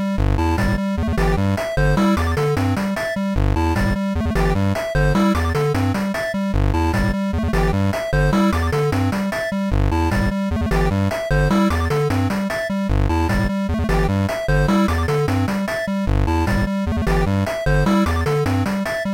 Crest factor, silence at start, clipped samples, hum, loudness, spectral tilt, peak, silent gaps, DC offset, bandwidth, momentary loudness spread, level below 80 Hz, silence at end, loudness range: 10 dB; 0 s; under 0.1%; none; -19 LUFS; -7 dB/octave; -8 dBFS; none; 0.2%; 16.5 kHz; 4 LU; -26 dBFS; 0 s; 0 LU